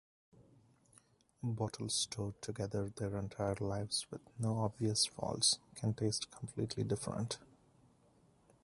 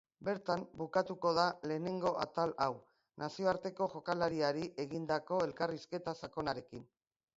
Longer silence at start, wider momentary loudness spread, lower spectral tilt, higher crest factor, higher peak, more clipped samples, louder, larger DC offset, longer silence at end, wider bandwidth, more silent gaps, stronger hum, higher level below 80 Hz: first, 0.4 s vs 0.2 s; about the same, 10 LU vs 8 LU; about the same, -4 dB/octave vs -4 dB/octave; about the same, 22 dB vs 22 dB; about the same, -18 dBFS vs -16 dBFS; neither; about the same, -38 LUFS vs -37 LUFS; neither; first, 1.2 s vs 0.55 s; first, 11.5 kHz vs 7.6 kHz; neither; neither; first, -64 dBFS vs -70 dBFS